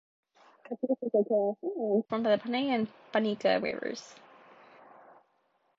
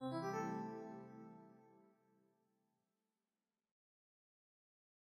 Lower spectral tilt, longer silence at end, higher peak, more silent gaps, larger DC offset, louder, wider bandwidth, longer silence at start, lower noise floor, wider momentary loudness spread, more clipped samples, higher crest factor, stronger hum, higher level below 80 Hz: about the same, -6 dB/octave vs -6.5 dB/octave; second, 1.65 s vs 3.25 s; first, -14 dBFS vs -32 dBFS; neither; neither; first, -30 LUFS vs -47 LUFS; second, 7.6 kHz vs 15.5 kHz; first, 0.7 s vs 0 s; second, -73 dBFS vs under -90 dBFS; second, 10 LU vs 21 LU; neither; about the same, 18 dB vs 20 dB; neither; first, -78 dBFS vs under -90 dBFS